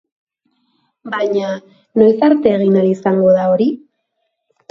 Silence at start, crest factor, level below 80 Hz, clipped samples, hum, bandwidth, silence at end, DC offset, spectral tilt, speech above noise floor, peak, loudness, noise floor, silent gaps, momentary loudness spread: 1.05 s; 16 dB; -58 dBFS; under 0.1%; none; 7.4 kHz; 0.95 s; under 0.1%; -8.5 dB/octave; 57 dB; 0 dBFS; -14 LUFS; -71 dBFS; none; 12 LU